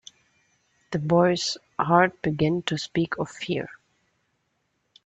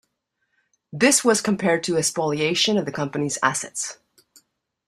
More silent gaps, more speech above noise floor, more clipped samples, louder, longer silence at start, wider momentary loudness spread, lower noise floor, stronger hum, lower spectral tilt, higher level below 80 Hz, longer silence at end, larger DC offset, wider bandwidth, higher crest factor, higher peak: neither; about the same, 50 dB vs 53 dB; neither; second, -24 LUFS vs -21 LUFS; about the same, 0.9 s vs 0.95 s; about the same, 10 LU vs 11 LU; about the same, -74 dBFS vs -75 dBFS; neither; first, -5.5 dB/octave vs -3 dB/octave; about the same, -60 dBFS vs -64 dBFS; first, 1.35 s vs 0.95 s; neither; second, 8.4 kHz vs 15 kHz; about the same, 22 dB vs 22 dB; about the same, -4 dBFS vs -2 dBFS